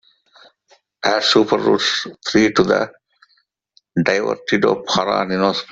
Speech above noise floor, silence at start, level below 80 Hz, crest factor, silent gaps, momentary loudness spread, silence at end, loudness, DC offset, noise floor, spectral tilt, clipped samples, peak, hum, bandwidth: 46 dB; 1.05 s; -56 dBFS; 18 dB; none; 6 LU; 0 s; -17 LUFS; under 0.1%; -63 dBFS; -4.5 dB/octave; under 0.1%; -2 dBFS; none; 8 kHz